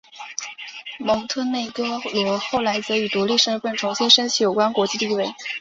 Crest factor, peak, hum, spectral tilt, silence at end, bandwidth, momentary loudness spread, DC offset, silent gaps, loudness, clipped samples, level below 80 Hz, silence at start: 20 dB; -2 dBFS; none; -2.5 dB/octave; 0 s; 7.8 kHz; 16 LU; under 0.1%; none; -20 LUFS; under 0.1%; -62 dBFS; 0.15 s